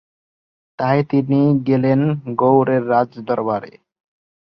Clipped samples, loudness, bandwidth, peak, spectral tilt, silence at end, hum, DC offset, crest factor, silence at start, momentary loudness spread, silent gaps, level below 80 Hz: under 0.1%; -17 LUFS; 5.8 kHz; -2 dBFS; -11 dB/octave; 0.9 s; none; under 0.1%; 16 dB; 0.8 s; 7 LU; none; -60 dBFS